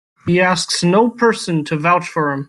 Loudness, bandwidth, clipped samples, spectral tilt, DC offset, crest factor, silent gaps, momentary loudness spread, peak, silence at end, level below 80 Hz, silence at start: -16 LUFS; 12.5 kHz; under 0.1%; -5 dB/octave; under 0.1%; 14 dB; none; 6 LU; -2 dBFS; 0.05 s; -56 dBFS; 0.25 s